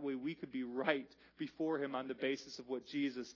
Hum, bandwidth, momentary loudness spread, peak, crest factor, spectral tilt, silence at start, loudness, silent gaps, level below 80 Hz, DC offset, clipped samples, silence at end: none; 6 kHz; 8 LU; -18 dBFS; 24 dB; -3.5 dB/octave; 0 s; -41 LUFS; none; -80 dBFS; under 0.1%; under 0.1%; 0 s